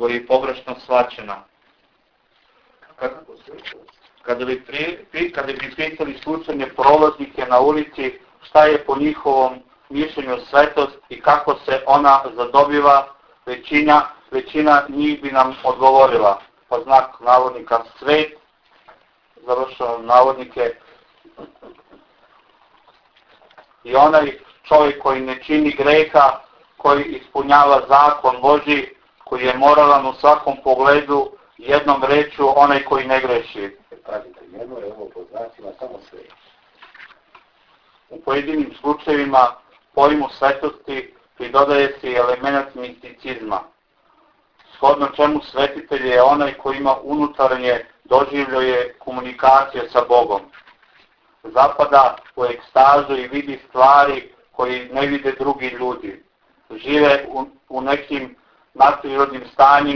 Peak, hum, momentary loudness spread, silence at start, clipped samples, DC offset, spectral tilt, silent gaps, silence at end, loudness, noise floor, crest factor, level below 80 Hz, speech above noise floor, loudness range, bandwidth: 0 dBFS; none; 18 LU; 0 s; under 0.1%; under 0.1%; -6 dB/octave; none; 0 s; -16 LUFS; -62 dBFS; 18 dB; -52 dBFS; 45 dB; 12 LU; 5.4 kHz